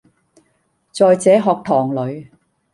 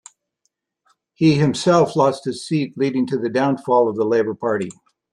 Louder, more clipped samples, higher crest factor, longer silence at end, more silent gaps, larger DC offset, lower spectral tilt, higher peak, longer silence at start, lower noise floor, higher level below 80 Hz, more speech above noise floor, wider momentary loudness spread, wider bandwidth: first, -15 LUFS vs -19 LUFS; neither; about the same, 16 dB vs 16 dB; about the same, 0.5 s vs 0.4 s; neither; neither; about the same, -6 dB/octave vs -6.5 dB/octave; about the same, -2 dBFS vs -2 dBFS; second, 0.95 s vs 1.2 s; second, -64 dBFS vs -72 dBFS; about the same, -62 dBFS vs -60 dBFS; second, 49 dB vs 54 dB; first, 18 LU vs 7 LU; about the same, 11.5 kHz vs 11.5 kHz